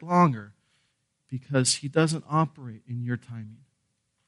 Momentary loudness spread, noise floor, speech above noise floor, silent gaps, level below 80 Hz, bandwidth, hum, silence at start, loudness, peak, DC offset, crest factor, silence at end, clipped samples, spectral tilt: 19 LU; -76 dBFS; 49 dB; none; -70 dBFS; 11.5 kHz; none; 0 s; -26 LUFS; -8 dBFS; under 0.1%; 20 dB; 0.75 s; under 0.1%; -5 dB/octave